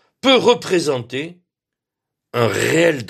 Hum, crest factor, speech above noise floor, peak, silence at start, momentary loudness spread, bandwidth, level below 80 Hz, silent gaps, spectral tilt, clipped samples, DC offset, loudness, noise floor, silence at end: none; 18 dB; 68 dB; 0 dBFS; 0.25 s; 14 LU; 14.5 kHz; -60 dBFS; none; -4.5 dB/octave; under 0.1%; under 0.1%; -17 LUFS; -84 dBFS; 0 s